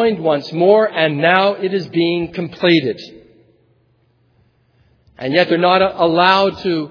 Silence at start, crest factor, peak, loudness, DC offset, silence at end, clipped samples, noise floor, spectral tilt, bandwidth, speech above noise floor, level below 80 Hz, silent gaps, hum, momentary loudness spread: 0 s; 16 dB; 0 dBFS; -15 LUFS; under 0.1%; 0 s; under 0.1%; -58 dBFS; -7 dB/octave; 5.4 kHz; 43 dB; -56 dBFS; none; none; 8 LU